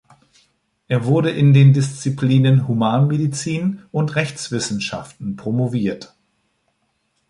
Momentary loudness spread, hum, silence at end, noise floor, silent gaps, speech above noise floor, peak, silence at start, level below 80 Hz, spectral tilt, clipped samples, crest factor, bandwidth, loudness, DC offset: 12 LU; none; 1.25 s; -68 dBFS; none; 51 dB; -2 dBFS; 0.9 s; -56 dBFS; -6.5 dB/octave; under 0.1%; 16 dB; 11 kHz; -18 LUFS; under 0.1%